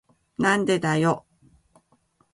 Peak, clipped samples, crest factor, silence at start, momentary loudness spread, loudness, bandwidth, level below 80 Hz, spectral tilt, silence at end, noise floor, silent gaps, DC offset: -6 dBFS; under 0.1%; 20 dB; 0.4 s; 10 LU; -23 LUFS; 11.5 kHz; -62 dBFS; -5.5 dB/octave; 1.15 s; -65 dBFS; none; under 0.1%